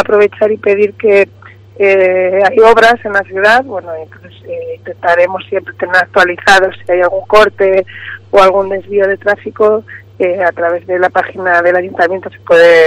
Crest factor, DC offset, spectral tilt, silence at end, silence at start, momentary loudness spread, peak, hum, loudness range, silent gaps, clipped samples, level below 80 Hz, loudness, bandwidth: 10 dB; under 0.1%; -4.5 dB/octave; 0 s; 0 s; 13 LU; 0 dBFS; none; 3 LU; none; 0.4%; -46 dBFS; -10 LUFS; 13 kHz